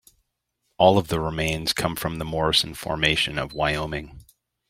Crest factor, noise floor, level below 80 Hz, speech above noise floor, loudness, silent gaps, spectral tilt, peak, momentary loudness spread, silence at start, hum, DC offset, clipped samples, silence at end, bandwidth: 24 dB; -76 dBFS; -44 dBFS; 52 dB; -23 LUFS; none; -4 dB/octave; 0 dBFS; 9 LU; 0.8 s; none; under 0.1%; under 0.1%; 0.45 s; 16 kHz